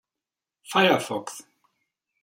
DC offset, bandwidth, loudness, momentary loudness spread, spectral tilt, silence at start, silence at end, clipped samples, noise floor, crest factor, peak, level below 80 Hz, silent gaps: under 0.1%; 16.5 kHz; -23 LUFS; 19 LU; -4 dB/octave; 0.7 s; 0.8 s; under 0.1%; -89 dBFS; 22 dB; -6 dBFS; -74 dBFS; none